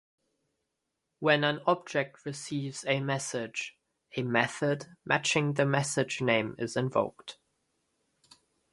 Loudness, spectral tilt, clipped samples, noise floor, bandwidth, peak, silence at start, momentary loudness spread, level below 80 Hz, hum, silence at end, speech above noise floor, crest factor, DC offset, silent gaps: -30 LUFS; -4.5 dB/octave; under 0.1%; -84 dBFS; 11.5 kHz; -8 dBFS; 1.2 s; 11 LU; -72 dBFS; none; 1.4 s; 54 dB; 24 dB; under 0.1%; none